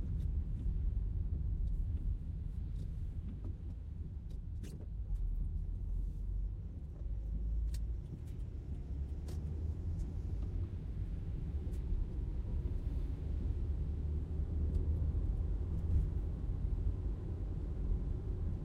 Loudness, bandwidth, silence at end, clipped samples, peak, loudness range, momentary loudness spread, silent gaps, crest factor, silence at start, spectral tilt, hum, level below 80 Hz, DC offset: -41 LUFS; 4.7 kHz; 0 s; under 0.1%; -24 dBFS; 5 LU; 8 LU; none; 14 dB; 0 s; -9.5 dB/octave; none; -40 dBFS; under 0.1%